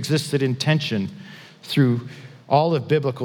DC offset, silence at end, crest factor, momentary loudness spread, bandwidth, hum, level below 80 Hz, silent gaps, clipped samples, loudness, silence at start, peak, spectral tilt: under 0.1%; 0 s; 18 dB; 21 LU; 18.5 kHz; none; -74 dBFS; none; under 0.1%; -21 LUFS; 0 s; -4 dBFS; -6 dB/octave